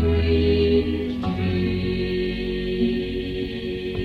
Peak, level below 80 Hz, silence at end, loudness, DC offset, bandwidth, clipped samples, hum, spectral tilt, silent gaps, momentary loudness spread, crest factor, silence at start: -8 dBFS; -32 dBFS; 0 s; -23 LUFS; under 0.1%; 5.8 kHz; under 0.1%; none; -8.5 dB/octave; none; 9 LU; 14 dB; 0 s